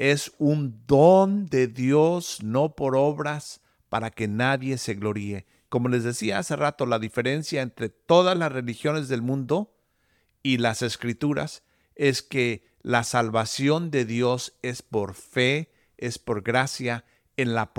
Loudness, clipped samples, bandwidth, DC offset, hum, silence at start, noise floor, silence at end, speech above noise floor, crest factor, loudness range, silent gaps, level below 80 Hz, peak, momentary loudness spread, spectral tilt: -25 LUFS; under 0.1%; 17 kHz; under 0.1%; none; 0 s; -68 dBFS; 0.1 s; 44 dB; 20 dB; 5 LU; none; -60 dBFS; -6 dBFS; 11 LU; -5.5 dB/octave